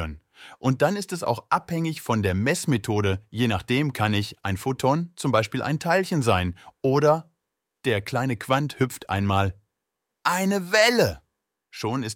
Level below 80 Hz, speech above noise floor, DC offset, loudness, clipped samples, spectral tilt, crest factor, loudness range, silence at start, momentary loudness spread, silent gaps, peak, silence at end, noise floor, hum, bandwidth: -52 dBFS; 59 dB; under 0.1%; -24 LUFS; under 0.1%; -5.5 dB/octave; 18 dB; 1 LU; 0 s; 8 LU; none; -6 dBFS; 0 s; -82 dBFS; none; 17 kHz